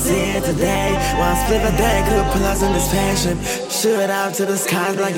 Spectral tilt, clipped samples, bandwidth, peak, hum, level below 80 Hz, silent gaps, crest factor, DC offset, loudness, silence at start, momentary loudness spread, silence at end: -4 dB/octave; under 0.1%; 17 kHz; -2 dBFS; none; -26 dBFS; none; 16 dB; under 0.1%; -18 LUFS; 0 s; 3 LU; 0 s